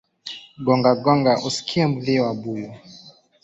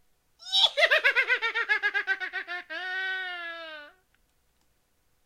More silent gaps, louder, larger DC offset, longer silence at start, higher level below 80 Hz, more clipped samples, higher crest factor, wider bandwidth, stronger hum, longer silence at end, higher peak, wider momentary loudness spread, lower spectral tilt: neither; first, -20 LUFS vs -25 LUFS; neither; second, 0.25 s vs 0.4 s; first, -60 dBFS vs -72 dBFS; neither; about the same, 18 dB vs 22 dB; second, 8 kHz vs 15.5 kHz; neither; second, 0.35 s vs 1.35 s; about the same, -4 dBFS vs -6 dBFS; about the same, 18 LU vs 18 LU; first, -6 dB/octave vs 1.5 dB/octave